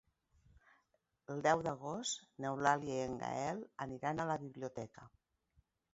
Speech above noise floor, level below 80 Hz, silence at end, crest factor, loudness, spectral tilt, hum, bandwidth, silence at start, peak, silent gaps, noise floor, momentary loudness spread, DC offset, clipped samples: 42 dB; -72 dBFS; 0.85 s; 24 dB; -39 LUFS; -4 dB/octave; none; 7.6 kHz; 1.3 s; -16 dBFS; none; -81 dBFS; 12 LU; under 0.1%; under 0.1%